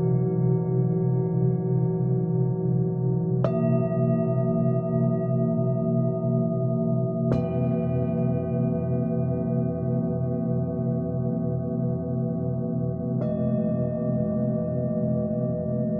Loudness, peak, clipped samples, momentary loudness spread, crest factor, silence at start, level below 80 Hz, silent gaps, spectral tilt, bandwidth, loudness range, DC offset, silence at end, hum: -25 LUFS; -10 dBFS; under 0.1%; 4 LU; 16 dB; 0 s; -48 dBFS; none; -13.5 dB/octave; 2.9 kHz; 3 LU; under 0.1%; 0 s; none